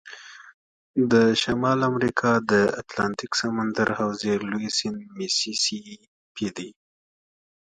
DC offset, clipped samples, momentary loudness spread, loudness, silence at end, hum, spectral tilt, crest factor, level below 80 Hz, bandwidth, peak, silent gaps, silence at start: under 0.1%; under 0.1%; 17 LU; -24 LUFS; 0.95 s; none; -4 dB/octave; 20 dB; -60 dBFS; 10.5 kHz; -4 dBFS; 0.54-0.94 s, 6.08-6.35 s; 0.05 s